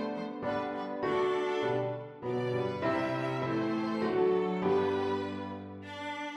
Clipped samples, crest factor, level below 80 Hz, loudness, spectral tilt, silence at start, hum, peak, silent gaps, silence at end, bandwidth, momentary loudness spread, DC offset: under 0.1%; 14 dB; -72 dBFS; -32 LUFS; -7 dB/octave; 0 s; none; -18 dBFS; none; 0 s; 8.4 kHz; 10 LU; under 0.1%